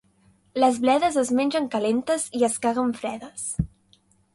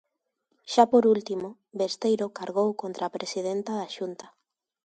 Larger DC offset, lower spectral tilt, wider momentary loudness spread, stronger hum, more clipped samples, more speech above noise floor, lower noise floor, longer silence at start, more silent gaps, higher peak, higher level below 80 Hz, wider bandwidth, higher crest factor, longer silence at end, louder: neither; about the same, -4.5 dB/octave vs -5 dB/octave; second, 11 LU vs 15 LU; neither; neither; second, 38 dB vs 51 dB; second, -61 dBFS vs -77 dBFS; about the same, 0.55 s vs 0.65 s; neither; about the same, -6 dBFS vs -4 dBFS; first, -48 dBFS vs -76 dBFS; first, 11.5 kHz vs 9.2 kHz; second, 18 dB vs 24 dB; about the same, 0.7 s vs 0.65 s; first, -24 LUFS vs -27 LUFS